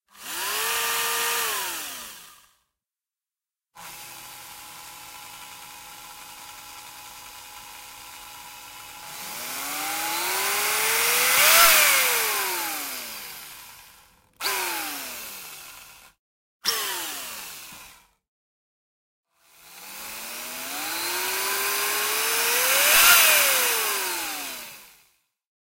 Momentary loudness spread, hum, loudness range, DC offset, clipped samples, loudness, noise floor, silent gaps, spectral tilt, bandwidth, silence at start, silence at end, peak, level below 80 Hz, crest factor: 25 LU; none; 22 LU; under 0.1%; under 0.1%; -21 LUFS; under -90 dBFS; 16.19-16.60 s, 18.28-19.24 s; 1.5 dB/octave; 16 kHz; 0.15 s; 0.75 s; -4 dBFS; -62 dBFS; 24 dB